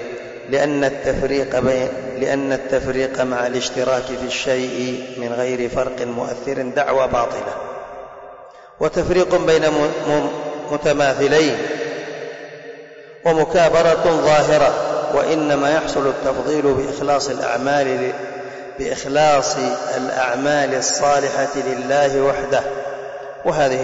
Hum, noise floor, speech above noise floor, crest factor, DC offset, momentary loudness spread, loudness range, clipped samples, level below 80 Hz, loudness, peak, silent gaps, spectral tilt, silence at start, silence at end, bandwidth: none; -40 dBFS; 22 dB; 12 dB; under 0.1%; 13 LU; 5 LU; under 0.1%; -44 dBFS; -18 LUFS; -6 dBFS; none; -4 dB/octave; 0 s; 0 s; 8 kHz